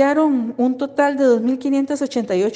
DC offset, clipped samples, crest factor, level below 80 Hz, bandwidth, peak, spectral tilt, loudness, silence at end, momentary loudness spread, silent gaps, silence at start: under 0.1%; under 0.1%; 14 dB; -66 dBFS; 9.4 kHz; -4 dBFS; -5.5 dB/octave; -18 LUFS; 0 s; 5 LU; none; 0 s